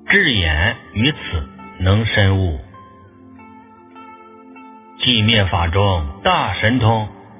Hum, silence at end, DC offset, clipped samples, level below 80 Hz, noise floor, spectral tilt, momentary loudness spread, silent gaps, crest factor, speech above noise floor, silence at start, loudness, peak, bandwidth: none; 0.2 s; under 0.1%; under 0.1%; -30 dBFS; -43 dBFS; -9.5 dB/octave; 11 LU; none; 18 dB; 27 dB; 0.05 s; -16 LUFS; 0 dBFS; 3.8 kHz